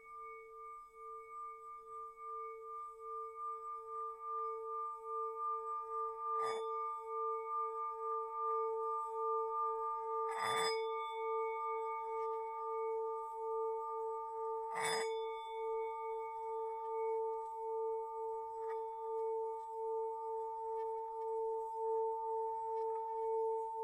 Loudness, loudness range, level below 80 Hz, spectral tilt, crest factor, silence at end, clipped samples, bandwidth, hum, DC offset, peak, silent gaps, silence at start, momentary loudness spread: -41 LUFS; 6 LU; -80 dBFS; -1.5 dB/octave; 18 dB; 0 s; under 0.1%; 13.5 kHz; none; under 0.1%; -24 dBFS; none; 0 s; 9 LU